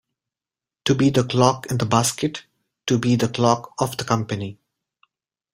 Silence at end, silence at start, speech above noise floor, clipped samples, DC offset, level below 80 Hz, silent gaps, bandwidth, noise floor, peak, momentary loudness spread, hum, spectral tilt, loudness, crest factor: 1 s; 0.85 s; over 70 dB; under 0.1%; under 0.1%; -54 dBFS; none; 16 kHz; under -90 dBFS; -2 dBFS; 10 LU; none; -5 dB/octave; -21 LUFS; 20 dB